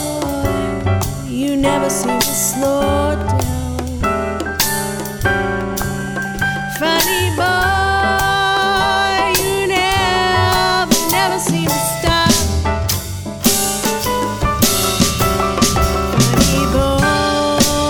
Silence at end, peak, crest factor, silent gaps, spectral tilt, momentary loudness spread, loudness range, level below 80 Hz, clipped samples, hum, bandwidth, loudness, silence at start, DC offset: 0 s; 0 dBFS; 16 dB; none; -3.5 dB/octave; 6 LU; 4 LU; -28 dBFS; under 0.1%; none; over 20 kHz; -15 LUFS; 0 s; under 0.1%